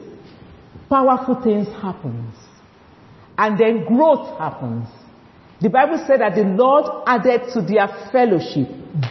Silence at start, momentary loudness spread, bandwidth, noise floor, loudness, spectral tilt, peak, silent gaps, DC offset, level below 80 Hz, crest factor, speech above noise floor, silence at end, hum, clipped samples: 0 s; 13 LU; 6.2 kHz; -47 dBFS; -18 LUFS; -8 dB/octave; -2 dBFS; none; under 0.1%; -56 dBFS; 16 dB; 30 dB; 0 s; none; under 0.1%